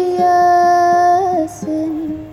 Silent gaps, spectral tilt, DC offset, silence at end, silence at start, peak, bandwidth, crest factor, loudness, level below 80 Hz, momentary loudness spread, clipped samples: none; -5.5 dB/octave; under 0.1%; 0 s; 0 s; -4 dBFS; 13 kHz; 10 dB; -14 LUFS; -50 dBFS; 10 LU; under 0.1%